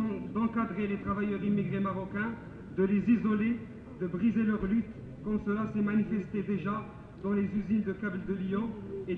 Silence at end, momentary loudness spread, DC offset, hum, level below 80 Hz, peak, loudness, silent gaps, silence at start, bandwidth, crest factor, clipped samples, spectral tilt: 0 s; 10 LU; under 0.1%; none; -54 dBFS; -16 dBFS; -32 LUFS; none; 0 s; 4.1 kHz; 16 dB; under 0.1%; -10 dB/octave